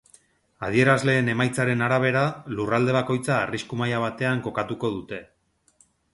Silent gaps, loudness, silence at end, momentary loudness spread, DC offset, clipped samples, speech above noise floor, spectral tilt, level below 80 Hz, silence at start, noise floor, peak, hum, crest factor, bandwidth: none; -24 LUFS; 0.9 s; 10 LU; under 0.1%; under 0.1%; 39 dB; -6 dB/octave; -58 dBFS; 0.6 s; -62 dBFS; -6 dBFS; none; 20 dB; 11.5 kHz